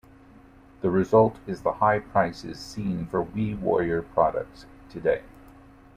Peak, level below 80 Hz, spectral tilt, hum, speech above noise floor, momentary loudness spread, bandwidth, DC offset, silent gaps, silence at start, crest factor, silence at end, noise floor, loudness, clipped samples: -6 dBFS; -50 dBFS; -7.5 dB/octave; none; 27 dB; 13 LU; 13 kHz; under 0.1%; none; 0.8 s; 20 dB; 0.65 s; -51 dBFS; -25 LUFS; under 0.1%